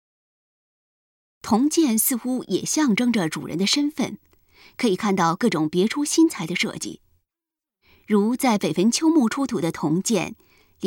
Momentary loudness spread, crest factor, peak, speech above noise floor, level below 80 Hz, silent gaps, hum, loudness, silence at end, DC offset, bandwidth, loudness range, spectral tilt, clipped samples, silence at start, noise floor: 8 LU; 16 dB; -6 dBFS; 67 dB; -62 dBFS; none; none; -21 LUFS; 0 s; under 0.1%; 19 kHz; 2 LU; -4 dB/octave; under 0.1%; 1.45 s; -89 dBFS